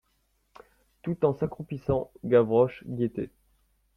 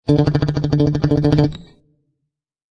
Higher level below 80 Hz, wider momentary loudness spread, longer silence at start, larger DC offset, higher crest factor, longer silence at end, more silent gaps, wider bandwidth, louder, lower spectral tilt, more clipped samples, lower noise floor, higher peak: second, -56 dBFS vs -36 dBFS; first, 14 LU vs 5 LU; first, 1.05 s vs 0.05 s; neither; about the same, 20 dB vs 16 dB; second, 0.7 s vs 1.1 s; neither; second, 5.4 kHz vs 7 kHz; second, -27 LUFS vs -17 LUFS; first, -10 dB/octave vs -8.5 dB/octave; neither; second, -72 dBFS vs -77 dBFS; second, -10 dBFS vs -2 dBFS